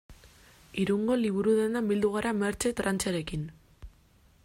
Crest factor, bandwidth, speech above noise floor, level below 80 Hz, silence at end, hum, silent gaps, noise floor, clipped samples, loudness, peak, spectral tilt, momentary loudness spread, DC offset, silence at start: 16 dB; 16 kHz; 33 dB; -54 dBFS; 0.55 s; none; none; -61 dBFS; under 0.1%; -29 LUFS; -14 dBFS; -5 dB/octave; 11 LU; under 0.1%; 0.1 s